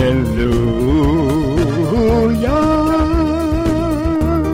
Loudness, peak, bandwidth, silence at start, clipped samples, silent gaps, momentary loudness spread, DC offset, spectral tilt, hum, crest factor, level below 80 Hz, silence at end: -15 LUFS; -6 dBFS; 16 kHz; 0 s; under 0.1%; none; 3 LU; under 0.1%; -7.5 dB/octave; none; 8 dB; -24 dBFS; 0 s